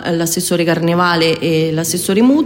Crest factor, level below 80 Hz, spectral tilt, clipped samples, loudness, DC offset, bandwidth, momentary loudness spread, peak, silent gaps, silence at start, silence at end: 14 dB; -50 dBFS; -4.5 dB/octave; under 0.1%; -14 LUFS; under 0.1%; 16.5 kHz; 4 LU; 0 dBFS; none; 0 s; 0 s